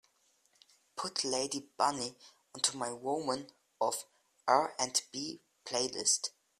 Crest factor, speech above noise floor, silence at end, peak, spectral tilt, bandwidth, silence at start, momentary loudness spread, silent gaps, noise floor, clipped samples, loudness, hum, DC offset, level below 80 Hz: 24 dB; 38 dB; 0.3 s; -12 dBFS; -1.5 dB/octave; 15 kHz; 0.95 s; 12 LU; none; -72 dBFS; under 0.1%; -34 LUFS; none; under 0.1%; -78 dBFS